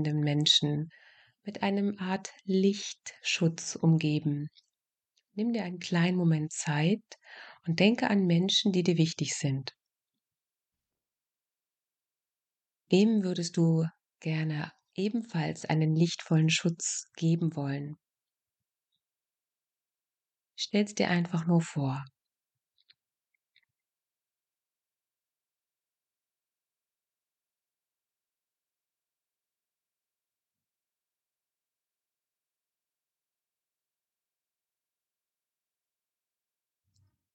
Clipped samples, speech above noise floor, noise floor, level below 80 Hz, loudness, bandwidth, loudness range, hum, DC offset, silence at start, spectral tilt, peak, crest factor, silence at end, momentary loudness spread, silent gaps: under 0.1%; over 61 dB; under -90 dBFS; -78 dBFS; -29 LUFS; 9 kHz; 9 LU; none; under 0.1%; 0 s; -5 dB/octave; -10 dBFS; 22 dB; 15.3 s; 13 LU; none